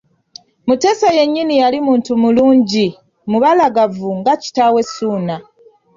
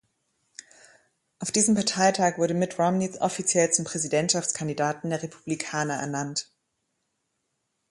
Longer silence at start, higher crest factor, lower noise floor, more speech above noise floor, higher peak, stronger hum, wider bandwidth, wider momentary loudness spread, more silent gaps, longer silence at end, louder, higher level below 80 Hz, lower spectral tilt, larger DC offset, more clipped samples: second, 0.65 s vs 1.4 s; second, 12 dB vs 20 dB; second, -42 dBFS vs -78 dBFS; second, 29 dB vs 52 dB; first, -2 dBFS vs -8 dBFS; neither; second, 7.6 kHz vs 11.5 kHz; about the same, 9 LU vs 11 LU; neither; second, 0.55 s vs 1.5 s; first, -14 LUFS vs -25 LUFS; first, -56 dBFS vs -68 dBFS; first, -5.5 dB/octave vs -3.5 dB/octave; neither; neither